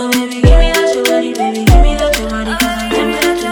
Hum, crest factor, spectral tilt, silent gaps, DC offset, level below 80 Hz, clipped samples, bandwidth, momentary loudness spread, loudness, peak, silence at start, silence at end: none; 12 dB; -5 dB/octave; none; under 0.1%; -14 dBFS; 0.5%; 19.5 kHz; 5 LU; -13 LUFS; 0 dBFS; 0 s; 0 s